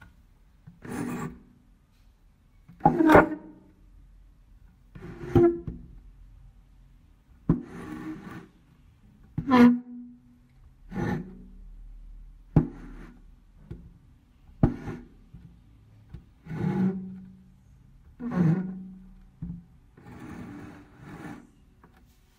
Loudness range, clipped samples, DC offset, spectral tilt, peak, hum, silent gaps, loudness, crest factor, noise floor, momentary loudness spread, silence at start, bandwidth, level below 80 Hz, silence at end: 10 LU; under 0.1%; under 0.1%; -8.5 dB/octave; -4 dBFS; none; none; -26 LUFS; 26 dB; -59 dBFS; 28 LU; 0.85 s; 16 kHz; -48 dBFS; 1 s